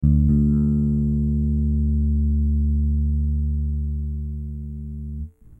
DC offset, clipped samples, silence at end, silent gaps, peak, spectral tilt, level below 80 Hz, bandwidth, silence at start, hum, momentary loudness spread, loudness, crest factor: under 0.1%; under 0.1%; 0.05 s; none; -8 dBFS; -13.5 dB/octave; -24 dBFS; 1.4 kHz; 0 s; none; 14 LU; -22 LUFS; 12 dB